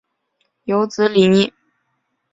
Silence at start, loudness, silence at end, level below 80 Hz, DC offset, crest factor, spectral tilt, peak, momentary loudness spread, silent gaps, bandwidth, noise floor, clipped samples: 0.65 s; -16 LUFS; 0.85 s; -58 dBFS; under 0.1%; 18 dB; -6 dB/octave; -2 dBFS; 9 LU; none; 7.8 kHz; -70 dBFS; under 0.1%